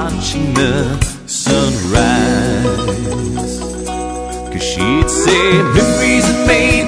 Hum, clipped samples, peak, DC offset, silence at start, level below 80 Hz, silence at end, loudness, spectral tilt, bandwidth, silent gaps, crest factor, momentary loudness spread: none; under 0.1%; 0 dBFS; under 0.1%; 0 s; -26 dBFS; 0 s; -14 LUFS; -4.5 dB/octave; 11 kHz; none; 14 dB; 11 LU